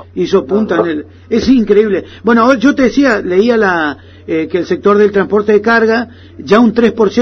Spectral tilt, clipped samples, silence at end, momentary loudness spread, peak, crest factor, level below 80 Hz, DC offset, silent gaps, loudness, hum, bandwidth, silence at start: -6.5 dB/octave; under 0.1%; 0 s; 8 LU; 0 dBFS; 10 dB; -42 dBFS; under 0.1%; none; -11 LUFS; none; 7.2 kHz; 0 s